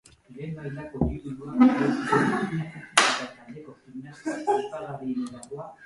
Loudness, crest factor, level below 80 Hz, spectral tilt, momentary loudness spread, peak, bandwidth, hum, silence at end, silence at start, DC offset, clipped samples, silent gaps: -26 LUFS; 26 dB; -48 dBFS; -4.5 dB/octave; 21 LU; 0 dBFS; 11.5 kHz; none; 0 s; 0.3 s; under 0.1%; under 0.1%; none